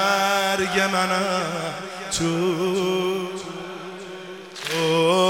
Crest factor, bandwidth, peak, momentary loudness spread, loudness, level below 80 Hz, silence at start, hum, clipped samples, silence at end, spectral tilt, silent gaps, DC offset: 18 dB; 17 kHz; -6 dBFS; 15 LU; -23 LUFS; -58 dBFS; 0 s; none; under 0.1%; 0 s; -4 dB/octave; none; under 0.1%